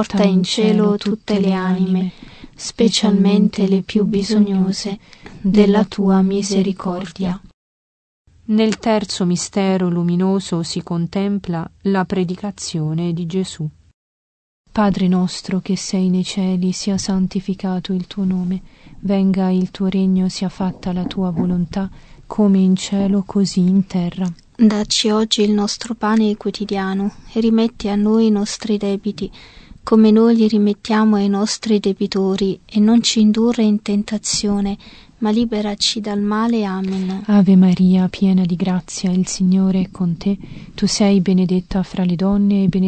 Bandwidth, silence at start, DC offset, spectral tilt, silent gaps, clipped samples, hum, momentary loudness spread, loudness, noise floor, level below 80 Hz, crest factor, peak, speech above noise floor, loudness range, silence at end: 8.8 kHz; 0 s; under 0.1%; -6 dB/octave; 7.54-8.25 s, 13.94-14.64 s; under 0.1%; none; 9 LU; -17 LUFS; under -90 dBFS; -44 dBFS; 16 dB; 0 dBFS; over 73 dB; 5 LU; 0 s